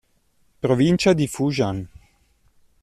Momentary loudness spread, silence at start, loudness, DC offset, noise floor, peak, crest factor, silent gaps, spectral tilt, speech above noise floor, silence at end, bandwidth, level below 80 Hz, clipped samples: 13 LU; 0.65 s; -21 LUFS; under 0.1%; -62 dBFS; -6 dBFS; 18 dB; none; -6 dB/octave; 43 dB; 0.95 s; 13.5 kHz; -52 dBFS; under 0.1%